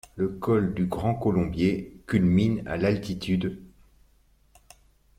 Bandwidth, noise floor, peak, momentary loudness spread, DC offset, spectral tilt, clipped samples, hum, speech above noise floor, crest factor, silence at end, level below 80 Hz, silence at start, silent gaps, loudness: 13 kHz; -62 dBFS; -10 dBFS; 8 LU; under 0.1%; -8 dB/octave; under 0.1%; none; 37 dB; 16 dB; 1.5 s; -48 dBFS; 0.15 s; none; -26 LUFS